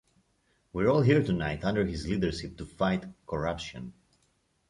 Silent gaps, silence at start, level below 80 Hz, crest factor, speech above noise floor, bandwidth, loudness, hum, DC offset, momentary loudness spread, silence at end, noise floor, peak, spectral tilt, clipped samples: none; 0.75 s; -48 dBFS; 20 dB; 43 dB; 11 kHz; -29 LUFS; none; under 0.1%; 16 LU; 0.8 s; -72 dBFS; -10 dBFS; -7 dB/octave; under 0.1%